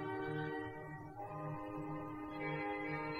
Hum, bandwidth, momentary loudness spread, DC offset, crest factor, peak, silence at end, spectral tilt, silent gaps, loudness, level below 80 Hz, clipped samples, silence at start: none; 13.5 kHz; 7 LU; under 0.1%; 14 dB; -30 dBFS; 0 s; -8 dB/octave; none; -44 LUFS; -66 dBFS; under 0.1%; 0 s